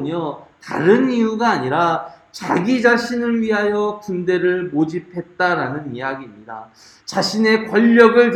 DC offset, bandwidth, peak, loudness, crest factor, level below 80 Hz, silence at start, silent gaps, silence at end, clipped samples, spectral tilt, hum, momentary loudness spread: under 0.1%; 12 kHz; 0 dBFS; -17 LUFS; 18 dB; -60 dBFS; 0 s; none; 0 s; under 0.1%; -5.5 dB/octave; none; 17 LU